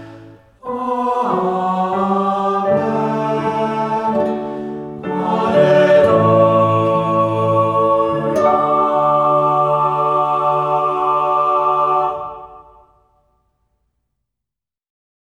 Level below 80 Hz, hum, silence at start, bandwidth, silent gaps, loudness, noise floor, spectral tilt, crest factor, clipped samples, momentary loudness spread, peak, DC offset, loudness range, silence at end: -54 dBFS; none; 0 s; 10 kHz; none; -15 LUFS; -85 dBFS; -8 dB/octave; 16 dB; under 0.1%; 10 LU; -2 dBFS; under 0.1%; 6 LU; 2.75 s